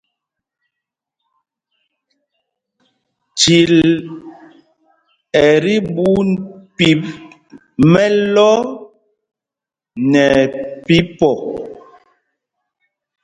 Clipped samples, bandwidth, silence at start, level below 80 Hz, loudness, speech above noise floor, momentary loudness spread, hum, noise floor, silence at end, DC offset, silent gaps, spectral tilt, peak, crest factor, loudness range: under 0.1%; 9.6 kHz; 3.35 s; -48 dBFS; -13 LUFS; 75 dB; 20 LU; none; -87 dBFS; 1.5 s; under 0.1%; none; -5 dB/octave; 0 dBFS; 16 dB; 3 LU